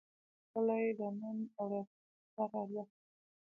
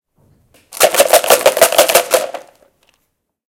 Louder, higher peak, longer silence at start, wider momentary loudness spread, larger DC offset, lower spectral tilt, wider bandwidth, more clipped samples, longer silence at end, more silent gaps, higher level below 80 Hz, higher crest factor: second, -40 LUFS vs -11 LUFS; second, -24 dBFS vs 0 dBFS; second, 0.55 s vs 0.7 s; first, 15 LU vs 10 LU; neither; first, -9 dB/octave vs 0 dB/octave; second, 3 kHz vs over 20 kHz; second, under 0.1% vs 0.5%; second, 0.65 s vs 1.1 s; first, 1.87-2.37 s vs none; second, under -90 dBFS vs -58 dBFS; about the same, 18 dB vs 14 dB